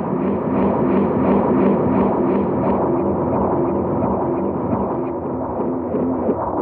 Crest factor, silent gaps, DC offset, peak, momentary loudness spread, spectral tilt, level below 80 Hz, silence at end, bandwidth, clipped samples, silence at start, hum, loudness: 14 dB; none; under 0.1%; -6 dBFS; 6 LU; -12.5 dB/octave; -42 dBFS; 0 s; 3.7 kHz; under 0.1%; 0 s; none; -19 LUFS